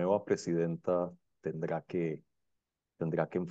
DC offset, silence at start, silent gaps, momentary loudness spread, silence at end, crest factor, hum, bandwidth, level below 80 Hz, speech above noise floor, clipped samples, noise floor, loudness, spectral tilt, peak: under 0.1%; 0 s; none; 9 LU; 0 s; 18 dB; none; 8.4 kHz; -72 dBFS; 51 dB; under 0.1%; -85 dBFS; -35 LUFS; -7.5 dB/octave; -16 dBFS